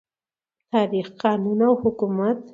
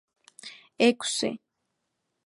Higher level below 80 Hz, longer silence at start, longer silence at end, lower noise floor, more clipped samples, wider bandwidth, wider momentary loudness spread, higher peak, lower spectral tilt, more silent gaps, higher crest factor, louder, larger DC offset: first, -60 dBFS vs -76 dBFS; first, 0.75 s vs 0.45 s; second, 0.05 s vs 0.9 s; first, under -90 dBFS vs -80 dBFS; neither; second, 7.4 kHz vs 11.5 kHz; second, 5 LU vs 21 LU; first, -4 dBFS vs -8 dBFS; first, -8.5 dB/octave vs -2.5 dB/octave; neither; about the same, 18 dB vs 22 dB; first, -22 LUFS vs -26 LUFS; neither